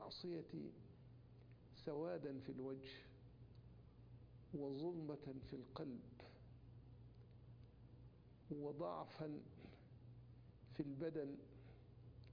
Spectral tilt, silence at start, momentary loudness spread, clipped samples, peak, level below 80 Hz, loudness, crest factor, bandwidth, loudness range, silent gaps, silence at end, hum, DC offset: -6.5 dB/octave; 0 s; 17 LU; under 0.1%; -32 dBFS; -72 dBFS; -52 LUFS; 22 dB; 5.2 kHz; 4 LU; none; 0 s; none; under 0.1%